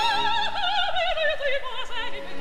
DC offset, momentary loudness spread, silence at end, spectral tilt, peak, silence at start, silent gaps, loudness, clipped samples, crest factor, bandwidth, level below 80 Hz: 4%; 8 LU; 0 s; -2 dB/octave; -12 dBFS; 0 s; none; -25 LUFS; under 0.1%; 14 dB; 13.5 kHz; -44 dBFS